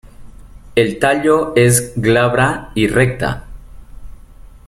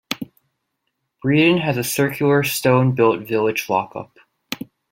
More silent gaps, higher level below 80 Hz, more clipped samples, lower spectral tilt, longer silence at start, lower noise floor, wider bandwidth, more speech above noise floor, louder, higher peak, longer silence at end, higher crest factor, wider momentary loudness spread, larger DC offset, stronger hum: neither; first, -36 dBFS vs -58 dBFS; neither; about the same, -5 dB/octave vs -5.5 dB/octave; about the same, 0.05 s vs 0.1 s; second, -38 dBFS vs -75 dBFS; second, 15 kHz vs 17 kHz; second, 24 dB vs 57 dB; first, -14 LUFS vs -18 LUFS; about the same, 0 dBFS vs -2 dBFS; second, 0.1 s vs 0.35 s; about the same, 16 dB vs 18 dB; second, 8 LU vs 16 LU; neither; neither